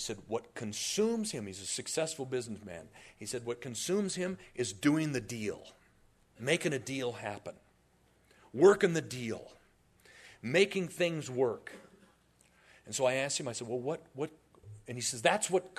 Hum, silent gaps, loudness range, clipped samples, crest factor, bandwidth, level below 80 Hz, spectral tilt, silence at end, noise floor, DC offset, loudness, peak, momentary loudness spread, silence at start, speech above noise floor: none; none; 5 LU; under 0.1%; 24 dB; 13.5 kHz; -70 dBFS; -4 dB/octave; 0.1 s; -68 dBFS; under 0.1%; -33 LUFS; -10 dBFS; 16 LU; 0 s; 35 dB